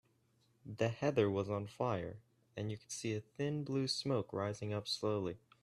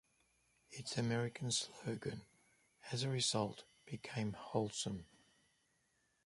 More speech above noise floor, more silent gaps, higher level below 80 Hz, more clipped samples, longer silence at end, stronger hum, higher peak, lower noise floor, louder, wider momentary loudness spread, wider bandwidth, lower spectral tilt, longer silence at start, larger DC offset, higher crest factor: about the same, 36 dB vs 39 dB; neither; about the same, -74 dBFS vs -72 dBFS; neither; second, 0.25 s vs 1.2 s; neither; first, -18 dBFS vs -22 dBFS; second, -75 dBFS vs -80 dBFS; about the same, -39 LUFS vs -41 LUFS; second, 11 LU vs 15 LU; first, 13 kHz vs 11.5 kHz; first, -5.5 dB/octave vs -4 dB/octave; about the same, 0.65 s vs 0.7 s; neither; about the same, 20 dB vs 22 dB